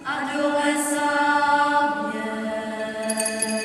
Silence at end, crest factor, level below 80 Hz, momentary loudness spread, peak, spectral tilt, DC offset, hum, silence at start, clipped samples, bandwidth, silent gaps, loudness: 0 s; 14 dB; -64 dBFS; 9 LU; -8 dBFS; -2.5 dB/octave; under 0.1%; none; 0 s; under 0.1%; 14 kHz; none; -22 LUFS